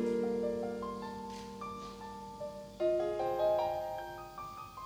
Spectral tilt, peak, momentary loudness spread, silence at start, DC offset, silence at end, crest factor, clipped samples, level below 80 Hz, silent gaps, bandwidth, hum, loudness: -6 dB/octave; -22 dBFS; 14 LU; 0 s; under 0.1%; 0 s; 16 dB; under 0.1%; -62 dBFS; none; 16.5 kHz; none; -37 LUFS